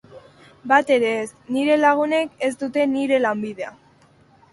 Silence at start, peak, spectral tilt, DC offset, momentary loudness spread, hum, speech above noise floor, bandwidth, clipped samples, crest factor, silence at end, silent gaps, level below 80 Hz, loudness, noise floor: 0.1 s; -2 dBFS; -4.5 dB/octave; under 0.1%; 13 LU; none; 34 dB; 11.5 kHz; under 0.1%; 20 dB; 0.8 s; none; -66 dBFS; -20 LUFS; -54 dBFS